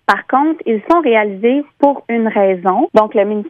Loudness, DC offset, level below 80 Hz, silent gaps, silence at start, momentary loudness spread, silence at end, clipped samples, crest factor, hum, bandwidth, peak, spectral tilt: -14 LUFS; under 0.1%; -56 dBFS; none; 0.1 s; 4 LU; 0 s; 0.1%; 14 dB; none; 9.4 kHz; 0 dBFS; -7 dB/octave